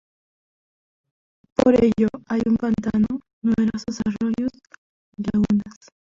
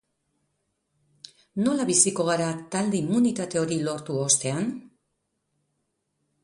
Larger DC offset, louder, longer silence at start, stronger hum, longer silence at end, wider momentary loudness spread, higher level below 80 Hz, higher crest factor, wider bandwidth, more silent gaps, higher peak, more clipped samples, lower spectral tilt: neither; about the same, -22 LUFS vs -24 LUFS; about the same, 1.6 s vs 1.55 s; neither; second, 0.4 s vs 1.55 s; about the same, 9 LU vs 10 LU; first, -48 dBFS vs -68 dBFS; about the same, 20 dB vs 22 dB; second, 7.6 kHz vs 11.5 kHz; first, 3.33-3.42 s, 4.78-5.12 s vs none; about the same, -2 dBFS vs -4 dBFS; neither; first, -7.5 dB/octave vs -4 dB/octave